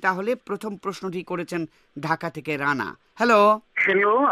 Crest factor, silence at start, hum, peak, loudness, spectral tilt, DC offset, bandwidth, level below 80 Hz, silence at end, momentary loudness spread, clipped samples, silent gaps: 18 dB; 0 s; none; -6 dBFS; -23 LUFS; -5.5 dB/octave; under 0.1%; 14.5 kHz; -68 dBFS; 0 s; 14 LU; under 0.1%; none